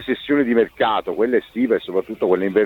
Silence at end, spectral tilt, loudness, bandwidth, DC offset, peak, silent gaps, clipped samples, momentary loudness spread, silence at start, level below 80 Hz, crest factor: 0 s; -7.5 dB/octave; -20 LUFS; 15 kHz; under 0.1%; -4 dBFS; none; under 0.1%; 3 LU; 0 s; -56 dBFS; 14 dB